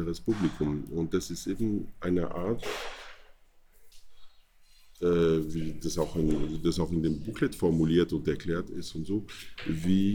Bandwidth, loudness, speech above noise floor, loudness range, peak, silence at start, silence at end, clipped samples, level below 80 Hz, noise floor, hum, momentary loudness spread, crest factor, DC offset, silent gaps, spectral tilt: 19.5 kHz; -30 LUFS; 29 dB; 6 LU; -12 dBFS; 0 s; 0 s; under 0.1%; -46 dBFS; -57 dBFS; none; 10 LU; 16 dB; under 0.1%; none; -6.5 dB/octave